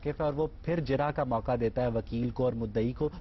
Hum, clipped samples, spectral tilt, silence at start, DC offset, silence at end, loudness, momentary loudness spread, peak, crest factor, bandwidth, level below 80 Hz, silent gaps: none; under 0.1%; -9.5 dB/octave; 0 s; under 0.1%; 0 s; -31 LUFS; 3 LU; -18 dBFS; 12 dB; 6 kHz; -46 dBFS; none